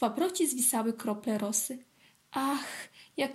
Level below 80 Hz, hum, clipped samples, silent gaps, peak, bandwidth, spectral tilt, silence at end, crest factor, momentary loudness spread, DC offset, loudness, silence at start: -82 dBFS; none; under 0.1%; none; -14 dBFS; 16 kHz; -2.5 dB/octave; 0 s; 18 dB; 14 LU; under 0.1%; -31 LUFS; 0 s